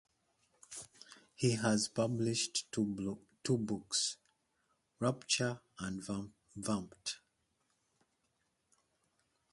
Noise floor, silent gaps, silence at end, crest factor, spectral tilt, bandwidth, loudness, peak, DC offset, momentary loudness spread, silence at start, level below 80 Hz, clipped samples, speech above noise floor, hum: -81 dBFS; none; 2.35 s; 22 dB; -4 dB/octave; 11.5 kHz; -37 LUFS; -16 dBFS; under 0.1%; 16 LU; 0.7 s; -70 dBFS; under 0.1%; 45 dB; none